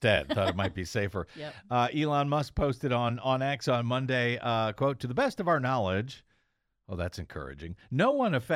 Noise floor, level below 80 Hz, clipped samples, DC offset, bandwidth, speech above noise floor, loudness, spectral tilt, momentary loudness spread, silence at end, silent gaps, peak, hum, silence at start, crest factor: -76 dBFS; -50 dBFS; under 0.1%; under 0.1%; 14.5 kHz; 47 dB; -29 LUFS; -6 dB/octave; 14 LU; 0 s; none; -12 dBFS; none; 0 s; 18 dB